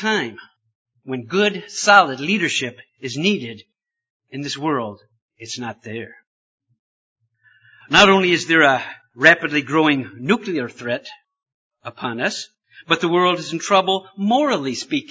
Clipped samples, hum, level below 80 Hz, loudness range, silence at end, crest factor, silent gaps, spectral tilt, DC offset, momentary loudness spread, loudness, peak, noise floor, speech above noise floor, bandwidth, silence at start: under 0.1%; none; -62 dBFS; 13 LU; 0.1 s; 20 dB; 0.75-0.85 s, 4.10-4.20 s, 5.22-5.29 s, 6.27-6.58 s, 6.79-7.16 s, 11.54-11.70 s; -4 dB/octave; under 0.1%; 19 LU; -18 LUFS; 0 dBFS; -56 dBFS; 37 dB; 8 kHz; 0 s